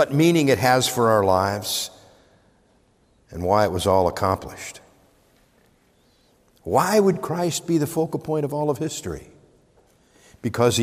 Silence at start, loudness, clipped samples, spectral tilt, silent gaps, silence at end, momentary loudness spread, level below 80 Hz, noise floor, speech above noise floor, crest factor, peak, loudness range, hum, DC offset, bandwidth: 0 s; -21 LUFS; under 0.1%; -5 dB/octave; none; 0 s; 15 LU; -56 dBFS; -60 dBFS; 40 dB; 18 dB; -4 dBFS; 4 LU; none; under 0.1%; 16 kHz